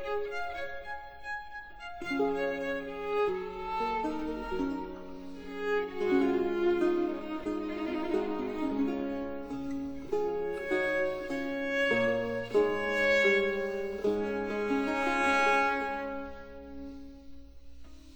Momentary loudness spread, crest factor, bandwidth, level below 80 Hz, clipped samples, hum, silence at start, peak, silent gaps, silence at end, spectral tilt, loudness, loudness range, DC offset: 16 LU; 16 dB; over 20 kHz; -54 dBFS; under 0.1%; none; 0 s; -16 dBFS; none; 0 s; -5 dB/octave; -31 LUFS; 6 LU; under 0.1%